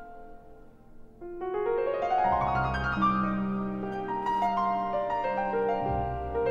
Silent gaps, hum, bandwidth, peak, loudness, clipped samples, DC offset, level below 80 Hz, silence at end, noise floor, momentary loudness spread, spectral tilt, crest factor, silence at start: none; none; 7.4 kHz; -14 dBFS; -29 LUFS; under 0.1%; under 0.1%; -46 dBFS; 0 s; -50 dBFS; 8 LU; -8 dB/octave; 16 dB; 0 s